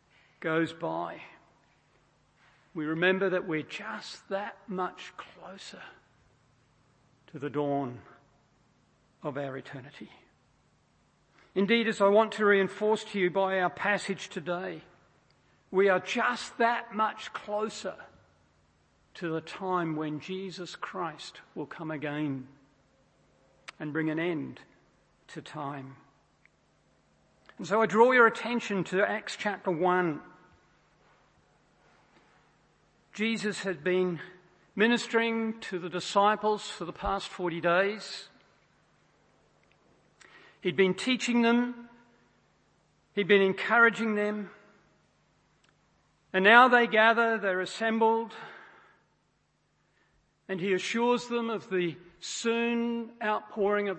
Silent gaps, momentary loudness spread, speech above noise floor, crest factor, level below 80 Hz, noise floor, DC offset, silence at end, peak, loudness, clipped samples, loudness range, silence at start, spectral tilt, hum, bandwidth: none; 19 LU; 44 dB; 26 dB; -66 dBFS; -72 dBFS; under 0.1%; 0 s; -4 dBFS; -28 LUFS; under 0.1%; 13 LU; 0.4 s; -5 dB/octave; none; 8.8 kHz